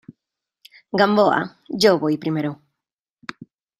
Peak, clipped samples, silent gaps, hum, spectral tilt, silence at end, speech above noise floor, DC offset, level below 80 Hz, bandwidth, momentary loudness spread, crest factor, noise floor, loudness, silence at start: -2 dBFS; under 0.1%; none; none; -5.5 dB/octave; 1.25 s; 66 dB; under 0.1%; -64 dBFS; 14.5 kHz; 21 LU; 20 dB; -85 dBFS; -19 LUFS; 0.95 s